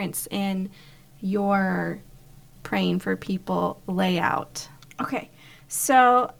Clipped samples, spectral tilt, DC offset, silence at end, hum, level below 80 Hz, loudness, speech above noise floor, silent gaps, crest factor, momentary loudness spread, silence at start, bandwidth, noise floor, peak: under 0.1%; -4.5 dB/octave; 0.2%; 0.1 s; none; -56 dBFS; -25 LUFS; 25 dB; none; 18 dB; 17 LU; 0 s; 19.5 kHz; -49 dBFS; -6 dBFS